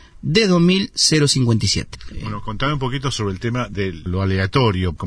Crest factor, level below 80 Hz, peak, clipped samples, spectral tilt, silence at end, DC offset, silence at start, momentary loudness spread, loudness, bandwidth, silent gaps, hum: 16 dB; -38 dBFS; -2 dBFS; under 0.1%; -4.5 dB/octave; 0 s; under 0.1%; 0.25 s; 12 LU; -18 LUFS; 10.5 kHz; none; none